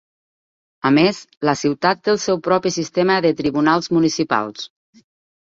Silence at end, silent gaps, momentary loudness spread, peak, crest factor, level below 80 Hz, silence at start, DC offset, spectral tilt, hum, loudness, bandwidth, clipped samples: 0.75 s; 1.37-1.41 s; 7 LU; -2 dBFS; 18 dB; -58 dBFS; 0.85 s; under 0.1%; -5 dB/octave; none; -18 LUFS; 7.8 kHz; under 0.1%